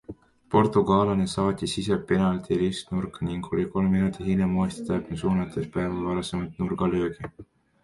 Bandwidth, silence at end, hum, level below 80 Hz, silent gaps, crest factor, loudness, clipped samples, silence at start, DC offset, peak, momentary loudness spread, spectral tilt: 11.5 kHz; 0.4 s; none; -46 dBFS; none; 20 dB; -26 LUFS; under 0.1%; 0.1 s; under 0.1%; -6 dBFS; 9 LU; -7 dB/octave